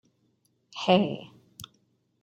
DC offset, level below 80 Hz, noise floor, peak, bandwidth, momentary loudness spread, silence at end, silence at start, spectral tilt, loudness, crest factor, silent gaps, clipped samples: under 0.1%; -70 dBFS; -71 dBFS; -6 dBFS; 13.5 kHz; 24 LU; 0.6 s; 0.75 s; -6 dB/octave; -25 LUFS; 24 dB; none; under 0.1%